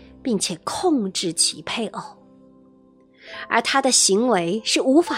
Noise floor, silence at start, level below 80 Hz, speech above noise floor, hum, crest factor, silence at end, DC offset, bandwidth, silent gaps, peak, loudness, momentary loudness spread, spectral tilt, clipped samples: -53 dBFS; 0 s; -62 dBFS; 33 dB; none; 20 dB; 0 s; under 0.1%; 16 kHz; none; -2 dBFS; -20 LUFS; 13 LU; -2.5 dB/octave; under 0.1%